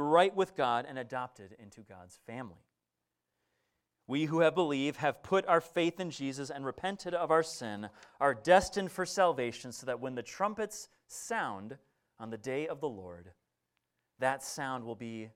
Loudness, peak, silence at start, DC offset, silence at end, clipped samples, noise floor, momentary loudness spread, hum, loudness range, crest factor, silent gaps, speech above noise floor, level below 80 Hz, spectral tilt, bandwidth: -33 LUFS; -10 dBFS; 0 s; under 0.1%; 0.05 s; under 0.1%; -87 dBFS; 18 LU; none; 9 LU; 24 dB; none; 54 dB; -66 dBFS; -4.5 dB/octave; 16 kHz